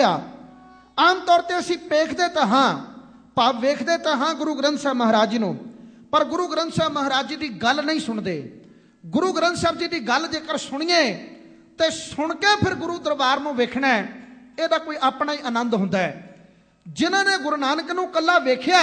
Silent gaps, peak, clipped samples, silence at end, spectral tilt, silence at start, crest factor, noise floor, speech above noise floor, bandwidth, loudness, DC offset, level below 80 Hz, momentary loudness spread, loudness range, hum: none; -4 dBFS; under 0.1%; 0 s; -4 dB/octave; 0 s; 18 dB; -53 dBFS; 31 dB; 10 kHz; -21 LUFS; under 0.1%; -60 dBFS; 10 LU; 3 LU; none